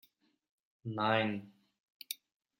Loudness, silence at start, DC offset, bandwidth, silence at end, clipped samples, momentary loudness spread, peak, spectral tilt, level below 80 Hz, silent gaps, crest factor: -36 LUFS; 0.85 s; under 0.1%; 16.5 kHz; 0.45 s; under 0.1%; 16 LU; -14 dBFS; -5 dB/octave; -80 dBFS; 1.83-2.00 s; 24 dB